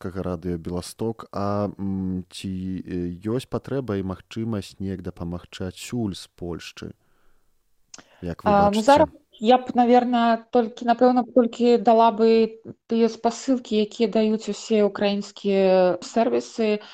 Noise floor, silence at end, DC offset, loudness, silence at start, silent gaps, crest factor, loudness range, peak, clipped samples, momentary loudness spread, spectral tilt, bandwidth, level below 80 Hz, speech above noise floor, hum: -63 dBFS; 0 s; under 0.1%; -22 LUFS; 0.05 s; none; 18 dB; 13 LU; -4 dBFS; under 0.1%; 15 LU; -6 dB/octave; 13 kHz; -56 dBFS; 41 dB; none